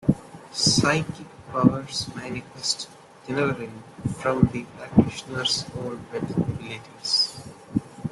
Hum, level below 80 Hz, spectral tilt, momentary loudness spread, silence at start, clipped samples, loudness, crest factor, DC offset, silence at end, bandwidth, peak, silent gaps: none; -50 dBFS; -4.5 dB/octave; 13 LU; 0 s; under 0.1%; -25 LUFS; 22 dB; under 0.1%; 0 s; 12.5 kHz; -2 dBFS; none